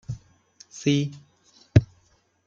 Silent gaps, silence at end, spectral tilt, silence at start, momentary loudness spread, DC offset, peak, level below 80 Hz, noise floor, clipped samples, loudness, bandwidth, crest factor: none; 0.6 s; -6.5 dB/octave; 0.1 s; 21 LU; under 0.1%; -2 dBFS; -46 dBFS; -64 dBFS; under 0.1%; -24 LUFS; 7.6 kHz; 24 dB